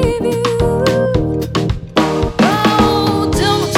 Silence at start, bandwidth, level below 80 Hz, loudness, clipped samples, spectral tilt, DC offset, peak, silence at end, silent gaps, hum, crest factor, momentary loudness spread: 0 s; 17.5 kHz; -28 dBFS; -14 LUFS; under 0.1%; -5.5 dB/octave; under 0.1%; 0 dBFS; 0 s; none; none; 14 dB; 6 LU